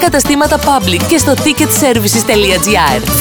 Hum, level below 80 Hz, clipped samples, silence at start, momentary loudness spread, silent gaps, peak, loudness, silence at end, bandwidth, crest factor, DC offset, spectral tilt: none; -28 dBFS; under 0.1%; 0 s; 1 LU; none; 0 dBFS; -9 LUFS; 0 s; over 20 kHz; 10 dB; under 0.1%; -3.5 dB/octave